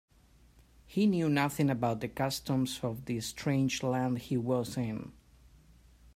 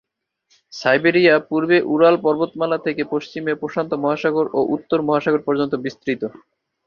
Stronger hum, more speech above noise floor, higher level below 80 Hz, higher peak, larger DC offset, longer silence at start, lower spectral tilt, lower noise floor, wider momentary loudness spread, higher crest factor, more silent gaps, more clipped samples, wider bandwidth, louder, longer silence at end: neither; second, 31 dB vs 47 dB; about the same, -60 dBFS vs -62 dBFS; second, -16 dBFS vs -2 dBFS; neither; first, 0.9 s vs 0.75 s; about the same, -6 dB/octave vs -6.5 dB/octave; second, -62 dBFS vs -66 dBFS; about the same, 8 LU vs 10 LU; about the same, 18 dB vs 18 dB; neither; neither; first, 16 kHz vs 7 kHz; second, -32 LUFS vs -19 LUFS; first, 1.05 s vs 0.55 s